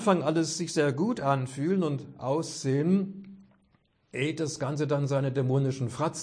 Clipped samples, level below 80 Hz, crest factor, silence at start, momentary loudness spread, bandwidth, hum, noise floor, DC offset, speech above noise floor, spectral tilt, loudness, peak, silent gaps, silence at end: under 0.1%; -70 dBFS; 20 dB; 0 s; 6 LU; 10.5 kHz; none; -68 dBFS; under 0.1%; 40 dB; -6 dB/octave; -29 LUFS; -10 dBFS; none; 0 s